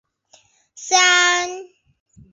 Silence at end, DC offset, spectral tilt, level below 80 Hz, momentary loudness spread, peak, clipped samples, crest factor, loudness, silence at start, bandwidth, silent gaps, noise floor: 0.65 s; under 0.1%; 1.5 dB/octave; -66 dBFS; 23 LU; 0 dBFS; under 0.1%; 20 dB; -15 LUFS; 0.75 s; 7.8 kHz; none; -56 dBFS